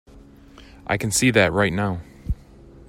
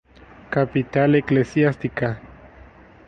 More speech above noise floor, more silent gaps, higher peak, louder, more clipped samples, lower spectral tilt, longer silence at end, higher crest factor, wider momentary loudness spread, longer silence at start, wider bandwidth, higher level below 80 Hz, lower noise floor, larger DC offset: about the same, 27 dB vs 27 dB; neither; first, -2 dBFS vs -6 dBFS; about the same, -21 LUFS vs -21 LUFS; neither; second, -4 dB/octave vs -8.5 dB/octave; second, 0.55 s vs 0.8 s; about the same, 20 dB vs 16 dB; first, 16 LU vs 8 LU; second, 0.15 s vs 0.5 s; first, 16 kHz vs 7.8 kHz; first, -38 dBFS vs -50 dBFS; about the same, -47 dBFS vs -46 dBFS; neither